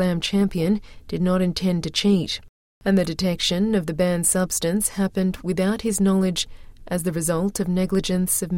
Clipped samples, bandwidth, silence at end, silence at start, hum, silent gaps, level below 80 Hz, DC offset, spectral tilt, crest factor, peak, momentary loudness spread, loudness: under 0.1%; 16.5 kHz; 0 s; 0 s; none; 2.49-2.81 s; -42 dBFS; under 0.1%; -4.5 dB/octave; 14 dB; -8 dBFS; 7 LU; -22 LUFS